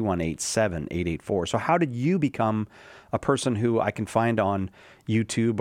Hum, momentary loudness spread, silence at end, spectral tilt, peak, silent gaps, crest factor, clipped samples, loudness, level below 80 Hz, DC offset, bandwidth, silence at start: none; 7 LU; 0 s; -5.5 dB/octave; -6 dBFS; none; 18 dB; under 0.1%; -26 LUFS; -54 dBFS; under 0.1%; 16 kHz; 0 s